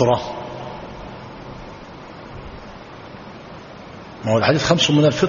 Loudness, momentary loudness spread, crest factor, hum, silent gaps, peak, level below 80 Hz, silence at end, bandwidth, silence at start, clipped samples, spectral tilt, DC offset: -19 LUFS; 22 LU; 22 dB; none; none; 0 dBFS; -46 dBFS; 0 s; 7.2 kHz; 0 s; under 0.1%; -4.5 dB/octave; under 0.1%